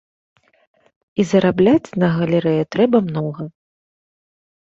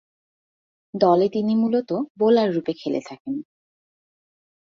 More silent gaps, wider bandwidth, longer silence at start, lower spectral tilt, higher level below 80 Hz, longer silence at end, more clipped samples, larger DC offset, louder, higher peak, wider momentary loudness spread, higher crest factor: second, none vs 2.10-2.15 s, 3.20-3.25 s; about the same, 7.8 kHz vs 7.4 kHz; first, 1.15 s vs 0.95 s; about the same, -7.5 dB/octave vs -7.5 dB/octave; first, -56 dBFS vs -68 dBFS; about the same, 1.2 s vs 1.25 s; neither; neither; first, -17 LUFS vs -22 LUFS; about the same, -2 dBFS vs -4 dBFS; about the same, 12 LU vs 13 LU; about the same, 18 dB vs 20 dB